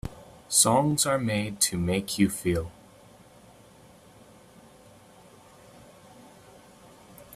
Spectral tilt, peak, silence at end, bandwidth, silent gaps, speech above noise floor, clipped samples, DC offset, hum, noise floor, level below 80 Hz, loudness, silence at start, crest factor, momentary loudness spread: -3.5 dB/octave; -6 dBFS; 0 s; 15.5 kHz; none; 28 dB; under 0.1%; under 0.1%; none; -53 dBFS; -54 dBFS; -24 LUFS; 0.05 s; 24 dB; 10 LU